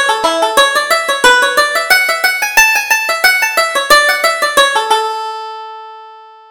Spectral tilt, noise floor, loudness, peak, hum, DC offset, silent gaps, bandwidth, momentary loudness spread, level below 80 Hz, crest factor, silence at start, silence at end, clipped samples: 1 dB/octave; -36 dBFS; -10 LUFS; 0 dBFS; none; under 0.1%; none; over 20 kHz; 13 LU; -46 dBFS; 12 dB; 0 s; 0.25 s; 0.1%